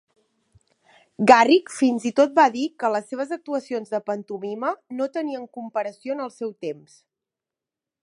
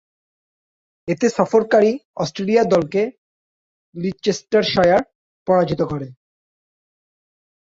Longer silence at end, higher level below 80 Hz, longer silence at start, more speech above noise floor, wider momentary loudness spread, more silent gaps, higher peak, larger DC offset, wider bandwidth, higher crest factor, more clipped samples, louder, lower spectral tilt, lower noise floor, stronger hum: second, 1.3 s vs 1.6 s; second, -72 dBFS vs -54 dBFS; first, 1.2 s vs 1.05 s; second, 66 dB vs over 72 dB; about the same, 16 LU vs 15 LU; second, none vs 2.05-2.14 s, 3.18-3.93 s, 5.15-5.46 s; about the same, 0 dBFS vs -2 dBFS; neither; first, 11.5 kHz vs 7.8 kHz; about the same, 22 dB vs 18 dB; neither; second, -22 LUFS vs -18 LUFS; about the same, -4.5 dB/octave vs -5.5 dB/octave; about the same, -88 dBFS vs under -90 dBFS; neither